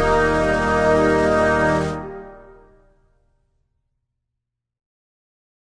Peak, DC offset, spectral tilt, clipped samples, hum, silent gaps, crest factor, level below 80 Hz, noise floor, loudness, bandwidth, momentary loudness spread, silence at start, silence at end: -6 dBFS; under 0.1%; -6 dB/octave; under 0.1%; none; none; 16 dB; -36 dBFS; -81 dBFS; -18 LUFS; 10.5 kHz; 14 LU; 0 s; 3.35 s